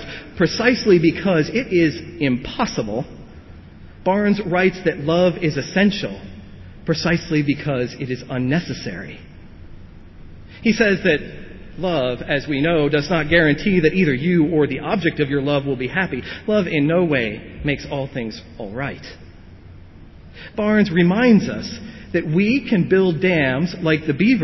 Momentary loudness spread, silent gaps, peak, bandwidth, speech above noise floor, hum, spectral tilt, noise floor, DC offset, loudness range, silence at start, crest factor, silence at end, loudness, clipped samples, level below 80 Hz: 15 LU; none; -4 dBFS; 6.2 kHz; 22 dB; none; -6.5 dB/octave; -41 dBFS; under 0.1%; 6 LU; 0 s; 16 dB; 0 s; -19 LUFS; under 0.1%; -44 dBFS